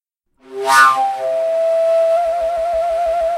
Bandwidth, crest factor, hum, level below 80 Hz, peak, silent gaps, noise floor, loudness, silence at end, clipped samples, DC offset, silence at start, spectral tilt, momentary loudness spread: 16 kHz; 16 dB; none; -48 dBFS; 0 dBFS; none; -51 dBFS; -15 LUFS; 0 s; under 0.1%; under 0.1%; 0.5 s; -1 dB/octave; 8 LU